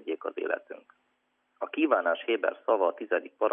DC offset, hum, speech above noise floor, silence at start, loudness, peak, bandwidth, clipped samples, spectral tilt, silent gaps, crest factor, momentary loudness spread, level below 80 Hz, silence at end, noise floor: under 0.1%; none; 47 dB; 0.05 s; -29 LUFS; -10 dBFS; 3.7 kHz; under 0.1%; -6 dB/octave; none; 20 dB; 12 LU; under -90 dBFS; 0 s; -75 dBFS